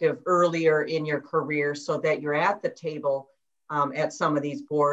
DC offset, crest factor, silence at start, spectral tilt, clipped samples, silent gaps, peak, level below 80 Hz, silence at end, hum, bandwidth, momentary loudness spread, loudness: under 0.1%; 16 dB; 0 s; -6 dB/octave; under 0.1%; none; -10 dBFS; -76 dBFS; 0 s; none; 8.2 kHz; 7 LU; -26 LUFS